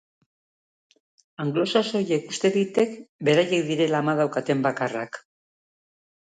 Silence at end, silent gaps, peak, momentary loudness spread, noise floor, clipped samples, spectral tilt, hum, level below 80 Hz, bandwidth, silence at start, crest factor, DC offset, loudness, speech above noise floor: 1.15 s; 3.09-3.19 s; -6 dBFS; 7 LU; under -90 dBFS; under 0.1%; -5.5 dB/octave; none; -72 dBFS; 9.4 kHz; 1.4 s; 18 dB; under 0.1%; -24 LUFS; over 67 dB